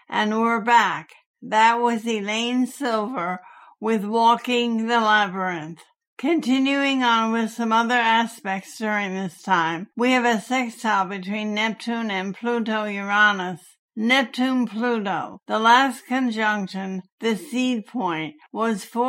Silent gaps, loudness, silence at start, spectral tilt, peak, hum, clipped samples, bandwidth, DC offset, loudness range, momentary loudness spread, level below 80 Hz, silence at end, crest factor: 1.26-1.34 s, 6.07-6.17 s, 13.79-13.89 s, 17.12-17.18 s; -22 LUFS; 0.1 s; -4 dB/octave; -4 dBFS; none; under 0.1%; 16 kHz; under 0.1%; 2 LU; 11 LU; -80 dBFS; 0 s; 18 dB